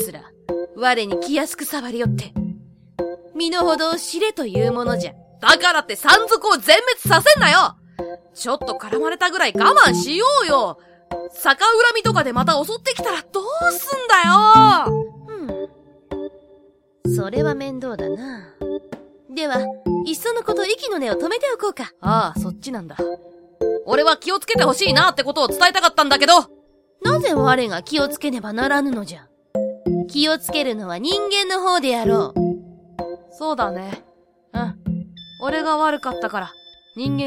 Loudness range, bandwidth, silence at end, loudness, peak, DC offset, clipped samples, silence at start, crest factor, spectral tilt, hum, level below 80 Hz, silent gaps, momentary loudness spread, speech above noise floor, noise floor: 10 LU; 16.5 kHz; 0 s; -18 LUFS; 0 dBFS; under 0.1%; under 0.1%; 0 s; 20 dB; -3.5 dB/octave; none; -48 dBFS; none; 18 LU; 35 dB; -53 dBFS